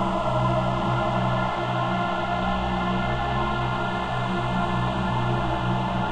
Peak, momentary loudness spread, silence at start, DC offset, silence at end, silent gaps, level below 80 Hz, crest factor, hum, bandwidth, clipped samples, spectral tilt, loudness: -12 dBFS; 2 LU; 0 s; under 0.1%; 0 s; none; -38 dBFS; 12 dB; none; 9 kHz; under 0.1%; -7 dB/octave; -25 LUFS